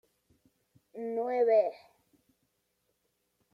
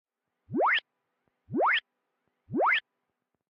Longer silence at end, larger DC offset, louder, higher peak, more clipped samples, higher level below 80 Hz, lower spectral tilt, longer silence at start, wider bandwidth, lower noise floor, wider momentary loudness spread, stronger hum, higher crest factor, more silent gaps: first, 1.75 s vs 0.7 s; neither; about the same, -29 LUFS vs -28 LUFS; about the same, -16 dBFS vs -16 dBFS; neither; second, -86 dBFS vs -80 dBFS; about the same, -6.5 dB/octave vs -6 dB/octave; first, 0.95 s vs 0.5 s; second, 5.8 kHz vs 7.2 kHz; second, -78 dBFS vs -83 dBFS; first, 16 LU vs 10 LU; first, 60 Hz at -70 dBFS vs none; about the same, 18 dB vs 16 dB; neither